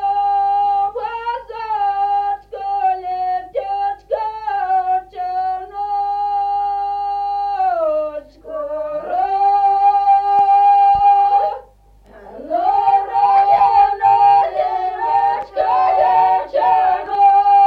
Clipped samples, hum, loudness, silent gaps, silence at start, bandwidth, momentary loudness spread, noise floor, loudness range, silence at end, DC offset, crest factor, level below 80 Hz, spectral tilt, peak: under 0.1%; 50 Hz at -55 dBFS; -16 LUFS; none; 0 s; 5 kHz; 12 LU; -47 dBFS; 7 LU; 0 s; under 0.1%; 12 dB; -50 dBFS; -5 dB/octave; -4 dBFS